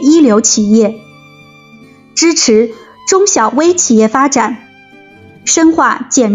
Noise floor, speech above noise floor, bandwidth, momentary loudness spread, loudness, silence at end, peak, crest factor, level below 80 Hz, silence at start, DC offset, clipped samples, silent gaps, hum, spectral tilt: -39 dBFS; 30 dB; 9.4 kHz; 11 LU; -10 LUFS; 0 s; 0 dBFS; 10 dB; -52 dBFS; 0 s; under 0.1%; under 0.1%; none; none; -3 dB/octave